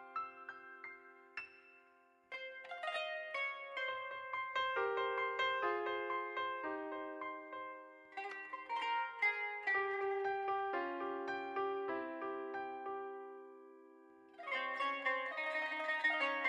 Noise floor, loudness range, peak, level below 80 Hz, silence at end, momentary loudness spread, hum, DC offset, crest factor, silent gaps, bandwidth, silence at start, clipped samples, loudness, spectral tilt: -69 dBFS; 6 LU; -24 dBFS; -90 dBFS; 0 s; 15 LU; none; under 0.1%; 18 dB; none; 11 kHz; 0 s; under 0.1%; -40 LUFS; -3 dB/octave